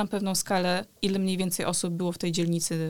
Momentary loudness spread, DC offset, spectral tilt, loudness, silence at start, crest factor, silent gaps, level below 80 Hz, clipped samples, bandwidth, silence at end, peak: 3 LU; 0.4%; -4.5 dB/octave; -27 LUFS; 0 s; 16 dB; none; -58 dBFS; under 0.1%; 19 kHz; 0 s; -12 dBFS